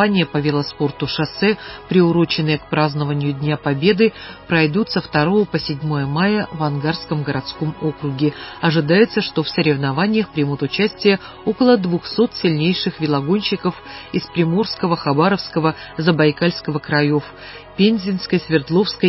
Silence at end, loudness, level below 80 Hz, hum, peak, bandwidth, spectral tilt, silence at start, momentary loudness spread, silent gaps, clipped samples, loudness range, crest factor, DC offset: 0 s; -18 LUFS; -48 dBFS; none; -2 dBFS; 5.8 kHz; -10 dB/octave; 0 s; 7 LU; none; under 0.1%; 2 LU; 16 dB; under 0.1%